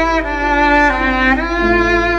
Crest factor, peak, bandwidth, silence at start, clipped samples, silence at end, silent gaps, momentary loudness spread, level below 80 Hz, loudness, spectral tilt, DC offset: 12 dB; -2 dBFS; 8.6 kHz; 0 s; under 0.1%; 0 s; none; 4 LU; -26 dBFS; -13 LUFS; -5.5 dB/octave; under 0.1%